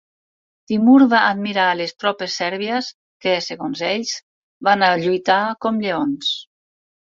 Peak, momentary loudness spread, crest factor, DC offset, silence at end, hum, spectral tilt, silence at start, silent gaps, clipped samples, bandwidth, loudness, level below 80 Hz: -2 dBFS; 12 LU; 18 dB; under 0.1%; 0.7 s; none; -4.5 dB/octave; 0.7 s; 2.94-3.20 s, 4.23-4.61 s; under 0.1%; 7.6 kHz; -18 LUFS; -66 dBFS